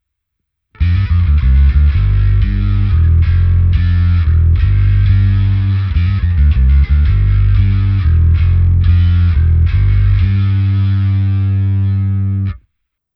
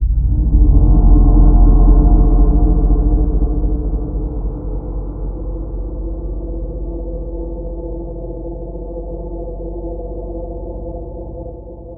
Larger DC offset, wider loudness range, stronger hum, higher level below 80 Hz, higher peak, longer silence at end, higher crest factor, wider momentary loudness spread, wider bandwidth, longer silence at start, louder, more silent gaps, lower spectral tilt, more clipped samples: neither; second, 1 LU vs 14 LU; neither; about the same, -14 dBFS vs -14 dBFS; about the same, -2 dBFS vs 0 dBFS; first, 0.6 s vs 0 s; about the same, 10 dB vs 14 dB; second, 4 LU vs 16 LU; first, 5.2 kHz vs 1.4 kHz; first, 0.8 s vs 0 s; first, -13 LUFS vs -18 LUFS; neither; second, -10 dB/octave vs -16 dB/octave; neither